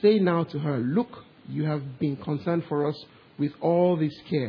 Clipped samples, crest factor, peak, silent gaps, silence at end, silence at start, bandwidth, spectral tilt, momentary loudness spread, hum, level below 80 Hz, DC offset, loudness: under 0.1%; 16 dB; -8 dBFS; none; 0 s; 0 s; 5.4 kHz; -10 dB/octave; 13 LU; none; -66 dBFS; under 0.1%; -27 LUFS